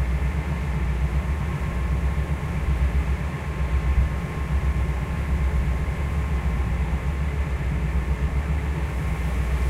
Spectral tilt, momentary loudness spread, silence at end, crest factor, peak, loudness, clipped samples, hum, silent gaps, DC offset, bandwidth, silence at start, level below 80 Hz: -7.5 dB/octave; 3 LU; 0 s; 14 dB; -10 dBFS; -26 LUFS; under 0.1%; none; none; under 0.1%; 11.5 kHz; 0 s; -24 dBFS